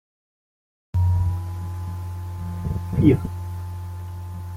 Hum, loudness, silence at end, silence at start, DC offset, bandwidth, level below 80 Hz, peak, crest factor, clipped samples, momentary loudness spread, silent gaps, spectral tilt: none; -25 LUFS; 0 s; 0.95 s; under 0.1%; 15 kHz; -40 dBFS; -2 dBFS; 22 dB; under 0.1%; 15 LU; none; -9 dB/octave